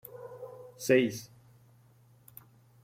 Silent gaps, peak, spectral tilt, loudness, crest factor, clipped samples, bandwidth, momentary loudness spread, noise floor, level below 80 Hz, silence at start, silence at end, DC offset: none; -14 dBFS; -5 dB/octave; -28 LUFS; 22 dB; under 0.1%; 16.5 kHz; 27 LU; -61 dBFS; -72 dBFS; 0.15 s; 1.6 s; under 0.1%